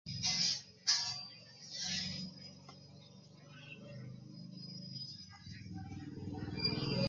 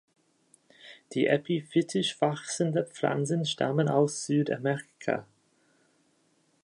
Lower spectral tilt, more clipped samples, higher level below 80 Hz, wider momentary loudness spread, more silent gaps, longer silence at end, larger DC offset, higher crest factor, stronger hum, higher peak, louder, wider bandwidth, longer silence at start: second, -3 dB/octave vs -5 dB/octave; neither; first, -64 dBFS vs -76 dBFS; first, 23 LU vs 7 LU; neither; second, 0 s vs 1.4 s; neither; about the same, 22 dB vs 22 dB; neither; second, -18 dBFS vs -8 dBFS; second, -38 LUFS vs -29 LUFS; about the same, 10.5 kHz vs 11 kHz; second, 0.05 s vs 0.85 s